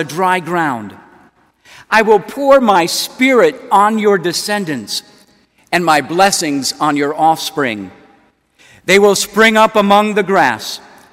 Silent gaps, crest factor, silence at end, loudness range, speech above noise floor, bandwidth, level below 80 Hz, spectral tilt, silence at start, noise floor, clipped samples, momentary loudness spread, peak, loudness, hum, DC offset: none; 14 dB; 0.35 s; 3 LU; 39 dB; 16.5 kHz; -54 dBFS; -3.5 dB/octave; 0 s; -52 dBFS; 0.1%; 13 LU; 0 dBFS; -12 LUFS; none; under 0.1%